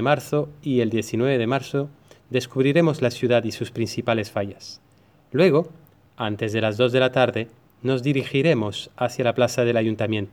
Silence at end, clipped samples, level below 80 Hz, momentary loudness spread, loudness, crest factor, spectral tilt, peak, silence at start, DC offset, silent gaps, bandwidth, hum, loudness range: 0.05 s; under 0.1%; -62 dBFS; 10 LU; -22 LUFS; 18 dB; -6 dB/octave; -4 dBFS; 0 s; under 0.1%; none; 17.5 kHz; none; 2 LU